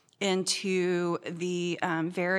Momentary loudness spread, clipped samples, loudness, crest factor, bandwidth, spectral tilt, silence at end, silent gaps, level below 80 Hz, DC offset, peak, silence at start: 5 LU; under 0.1%; -29 LUFS; 16 dB; 13.5 kHz; -4 dB/octave; 0 s; none; -82 dBFS; under 0.1%; -14 dBFS; 0.2 s